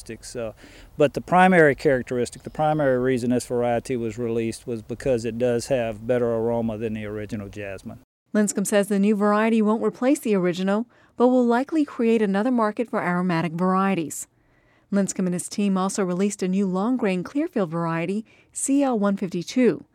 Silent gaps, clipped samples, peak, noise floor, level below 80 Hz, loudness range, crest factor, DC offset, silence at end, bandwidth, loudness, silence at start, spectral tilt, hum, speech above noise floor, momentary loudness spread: 8.04-8.26 s; under 0.1%; -2 dBFS; -60 dBFS; -54 dBFS; 4 LU; 20 dB; under 0.1%; 0.15 s; 14.5 kHz; -23 LUFS; 0 s; -6 dB/octave; none; 38 dB; 12 LU